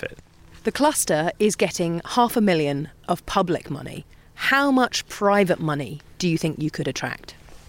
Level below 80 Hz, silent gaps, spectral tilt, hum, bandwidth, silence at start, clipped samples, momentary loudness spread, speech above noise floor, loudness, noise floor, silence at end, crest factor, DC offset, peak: -50 dBFS; none; -4.5 dB/octave; none; 16.5 kHz; 0 s; under 0.1%; 12 LU; 25 dB; -22 LUFS; -47 dBFS; 0.1 s; 18 dB; under 0.1%; -6 dBFS